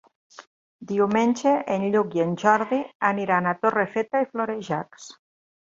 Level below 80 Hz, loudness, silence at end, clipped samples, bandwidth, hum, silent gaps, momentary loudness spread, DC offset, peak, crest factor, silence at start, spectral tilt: -68 dBFS; -23 LUFS; 0.65 s; under 0.1%; 7.8 kHz; none; 0.47-0.79 s, 2.95-3.00 s; 9 LU; under 0.1%; -4 dBFS; 20 dB; 0.4 s; -6 dB/octave